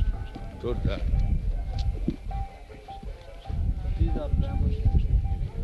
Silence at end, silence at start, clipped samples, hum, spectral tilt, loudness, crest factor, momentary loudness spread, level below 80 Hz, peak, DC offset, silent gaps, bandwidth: 0 s; 0 s; under 0.1%; none; -8.5 dB/octave; -30 LUFS; 16 dB; 15 LU; -28 dBFS; -10 dBFS; under 0.1%; none; 6 kHz